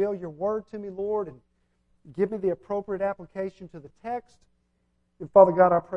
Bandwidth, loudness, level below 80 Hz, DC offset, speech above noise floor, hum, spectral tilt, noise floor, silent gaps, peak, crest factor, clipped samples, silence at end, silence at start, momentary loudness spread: 5.6 kHz; -25 LUFS; -62 dBFS; under 0.1%; 46 dB; 60 Hz at -60 dBFS; -9.5 dB/octave; -71 dBFS; none; -2 dBFS; 24 dB; under 0.1%; 0 s; 0 s; 22 LU